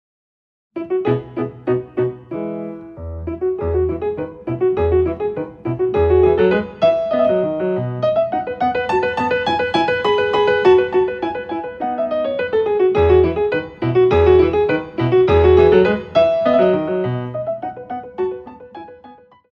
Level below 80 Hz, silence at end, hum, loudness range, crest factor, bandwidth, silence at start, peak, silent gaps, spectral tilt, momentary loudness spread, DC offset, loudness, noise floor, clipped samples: -36 dBFS; 0.4 s; none; 8 LU; 16 dB; 6.6 kHz; 0.75 s; -2 dBFS; none; -8 dB/octave; 14 LU; under 0.1%; -17 LUFS; -44 dBFS; under 0.1%